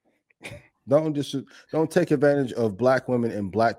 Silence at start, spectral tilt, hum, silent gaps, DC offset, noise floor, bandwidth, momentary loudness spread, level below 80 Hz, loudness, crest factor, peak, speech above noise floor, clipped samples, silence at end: 0.45 s; -7 dB/octave; none; none; under 0.1%; -46 dBFS; 15 kHz; 20 LU; -64 dBFS; -24 LUFS; 18 dB; -6 dBFS; 23 dB; under 0.1%; 0.05 s